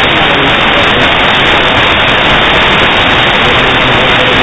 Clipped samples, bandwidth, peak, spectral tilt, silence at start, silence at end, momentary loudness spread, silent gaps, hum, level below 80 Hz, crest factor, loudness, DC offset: 2%; 8 kHz; 0 dBFS; -4.5 dB/octave; 0 s; 0 s; 1 LU; none; none; -24 dBFS; 8 dB; -6 LUFS; under 0.1%